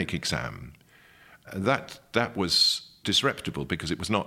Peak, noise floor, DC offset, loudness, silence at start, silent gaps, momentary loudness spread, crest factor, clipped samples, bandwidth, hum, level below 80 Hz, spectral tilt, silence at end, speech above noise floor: -6 dBFS; -56 dBFS; under 0.1%; -26 LUFS; 0 s; none; 13 LU; 22 dB; under 0.1%; 16.5 kHz; none; -54 dBFS; -3.5 dB/octave; 0 s; 28 dB